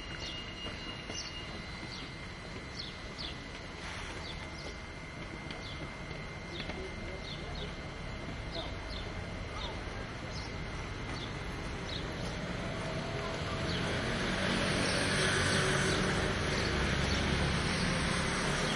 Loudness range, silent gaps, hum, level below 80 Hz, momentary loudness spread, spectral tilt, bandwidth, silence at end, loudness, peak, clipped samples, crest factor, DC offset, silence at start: 11 LU; none; none; -46 dBFS; 12 LU; -4 dB/octave; 11.5 kHz; 0 s; -36 LUFS; -18 dBFS; under 0.1%; 18 dB; under 0.1%; 0 s